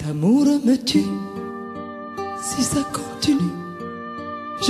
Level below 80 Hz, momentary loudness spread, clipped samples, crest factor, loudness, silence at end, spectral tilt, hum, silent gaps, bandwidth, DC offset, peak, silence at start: -52 dBFS; 15 LU; under 0.1%; 16 dB; -22 LUFS; 0 s; -4.5 dB/octave; none; none; 14 kHz; under 0.1%; -6 dBFS; 0 s